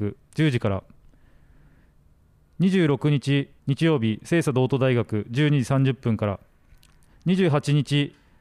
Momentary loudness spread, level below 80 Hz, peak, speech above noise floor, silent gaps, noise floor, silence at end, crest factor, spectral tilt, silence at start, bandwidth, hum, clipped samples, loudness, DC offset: 8 LU; -56 dBFS; -10 dBFS; 36 dB; none; -58 dBFS; 0.3 s; 14 dB; -7 dB/octave; 0 s; 12 kHz; none; under 0.1%; -23 LUFS; under 0.1%